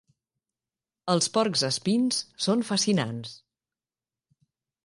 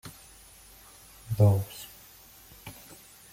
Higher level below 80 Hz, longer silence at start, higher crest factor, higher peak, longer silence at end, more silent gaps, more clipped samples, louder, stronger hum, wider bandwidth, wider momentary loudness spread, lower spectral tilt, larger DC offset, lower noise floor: second, -70 dBFS vs -58 dBFS; first, 1.05 s vs 0.05 s; about the same, 20 dB vs 20 dB; about the same, -8 dBFS vs -10 dBFS; first, 1.45 s vs 0.6 s; neither; neither; about the same, -25 LUFS vs -26 LUFS; neither; second, 11.5 kHz vs 16.5 kHz; second, 12 LU vs 26 LU; second, -4 dB/octave vs -7 dB/octave; neither; first, under -90 dBFS vs -53 dBFS